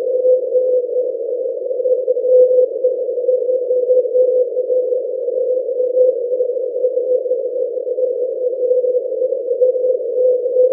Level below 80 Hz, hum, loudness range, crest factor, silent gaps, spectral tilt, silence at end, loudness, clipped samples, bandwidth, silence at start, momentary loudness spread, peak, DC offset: under -90 dBFS; none; 3 LU; 14 dB; none; -10.5 dB/octave; 0 s; -17 LUFS; under 0.1%; 0.7 kHz; 0 s; 6 LU; -2 dBFS; under 0.1%